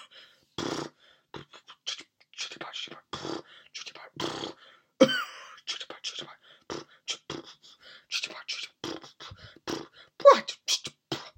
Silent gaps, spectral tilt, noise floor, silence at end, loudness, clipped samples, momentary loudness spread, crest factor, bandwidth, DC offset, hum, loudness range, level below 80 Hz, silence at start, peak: none; -2.5 dB/octave; -56 dBFS; 0.1 s; -30 LUFS; under 0.1%; 23 LU; 28 dB; 16 kHz; under 0.1%; none; 11 LU; -70 dBFS; 0 s; -4 dBFS